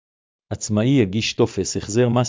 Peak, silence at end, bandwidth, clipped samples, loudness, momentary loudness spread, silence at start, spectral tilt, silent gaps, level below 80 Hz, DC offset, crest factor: -4 dBFS; 0 s; 7.6 kHz; under 0.1%; -20 LUFS; 9 LU; 0.5 s; -5.5 dB/octave; none; -46 dBFS; under 0.1%; 16 dB